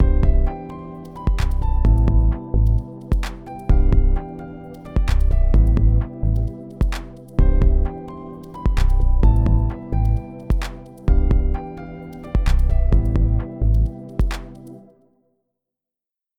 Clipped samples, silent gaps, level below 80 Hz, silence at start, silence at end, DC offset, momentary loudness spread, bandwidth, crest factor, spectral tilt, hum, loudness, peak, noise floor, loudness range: under 0.1%; none; -18 dBFS; 0 s; 1.55 s; under 0.1%; 16 LU; 7.8 kHz; 14 dB; -8 dB/octave; none; -21 LUFS; -4 dBFS; -86 dBFS; 2 LU